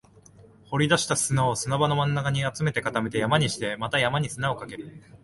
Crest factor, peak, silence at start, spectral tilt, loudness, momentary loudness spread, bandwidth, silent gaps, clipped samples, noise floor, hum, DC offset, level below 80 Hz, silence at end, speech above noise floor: 20 dB; -6 dBFS; 0.4 s; -4.5 dB/octave; -25 LUFS; 8 LU; 11.5 kHz; none; under 0.1%; -52 dBFS; none; under 0.1%; -54 dBFS; 0.05 s; 27 dB